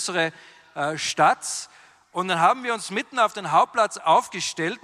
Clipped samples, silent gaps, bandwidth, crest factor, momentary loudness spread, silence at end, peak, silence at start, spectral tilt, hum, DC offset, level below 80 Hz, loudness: under 0.1%; none; 14.5 kHz; 18 dB; 10 LU; 0.05 s; -6 dBFS; 0 s; -2.5 dB/octave; none; under 0.1%; -74 dBFS; -23 LUFS